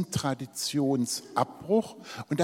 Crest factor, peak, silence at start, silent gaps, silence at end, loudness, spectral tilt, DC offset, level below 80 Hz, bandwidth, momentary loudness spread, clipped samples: 20 dB; -10 dBFS; 0 s; none; 0 s; -29 LUFS; -5 dB/octave; under 0.1%; -64 dBFS; 16.5 kHz; 7 LU; under 0.1%